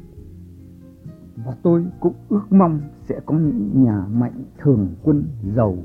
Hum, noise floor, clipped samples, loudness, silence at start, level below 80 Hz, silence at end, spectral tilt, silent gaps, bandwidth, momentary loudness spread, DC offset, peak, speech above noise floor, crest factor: none; -42 dBFS; under 0.1%; -19 LUFS; 0.05 s; -44 dBFS; 0 s; -12.5 dB/octave; none; 2.9 kHz; 14 LU; under 0.1%; -2 dBFS; 23 dB; 16 dB